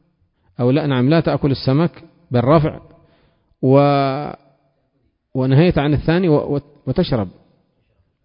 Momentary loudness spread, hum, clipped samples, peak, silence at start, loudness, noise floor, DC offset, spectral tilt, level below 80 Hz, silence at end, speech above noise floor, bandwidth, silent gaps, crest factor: 10 LU; none; under 0.1%; -2 dBFS; 0.6 s; -17 LUFS; -65 dBFS; under 0.1%; -12.5 dB/octave; -40 dBFS; 0.95 s; 50 dB; 5.4 kHz; none; 16 dB